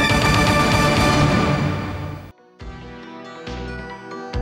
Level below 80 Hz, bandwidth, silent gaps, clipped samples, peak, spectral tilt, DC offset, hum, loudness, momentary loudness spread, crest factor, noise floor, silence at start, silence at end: -32 dBFS; 16.5 kHz; none; under 0.1%; -6 dBFS; -5 dB/octave; under 0.1%; none; -17 LUFS; 21 LU; 14 dB; -39 dBFS; 0 s; 0 s